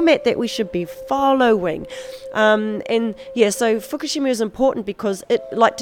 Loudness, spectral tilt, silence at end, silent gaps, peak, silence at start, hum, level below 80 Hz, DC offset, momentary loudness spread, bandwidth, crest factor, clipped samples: -19 LUFS; -4 dB/octave; 0 s; none; 0 dBFS; 0 s; none; -52 dBFS; under 0.1%; 9 LU; 18 kHz; 18 dB; under 0.1%